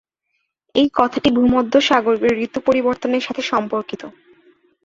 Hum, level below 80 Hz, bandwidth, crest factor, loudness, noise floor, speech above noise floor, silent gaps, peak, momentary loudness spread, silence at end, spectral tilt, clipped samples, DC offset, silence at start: none; -50 dBFS; 7.6 kHz; 18 dB; -17 LUFS; -72 dBFS; 55 dB; none; 0 dBFS; 10 LU; 0.75 s; -5 dB/octave; under 0.1%; under 0.1%; 0.75 s